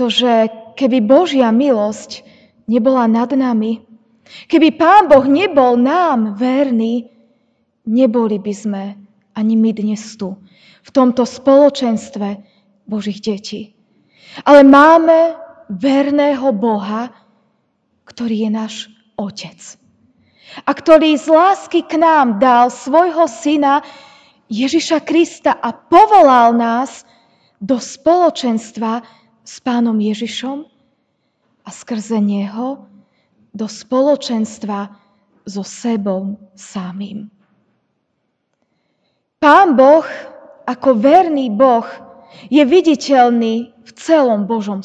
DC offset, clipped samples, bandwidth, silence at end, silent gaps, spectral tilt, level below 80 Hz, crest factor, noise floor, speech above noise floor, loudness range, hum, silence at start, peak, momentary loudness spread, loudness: under 0.1%; 0.3%; 9.2 kHz; 0 s; none; -5.5 dB/octave; -58 dBFS; 14 dB; -69 dBFS; 56 dB; 11 LU; none; 0 s; 0 dBFS; 18 LU; -13 LUFS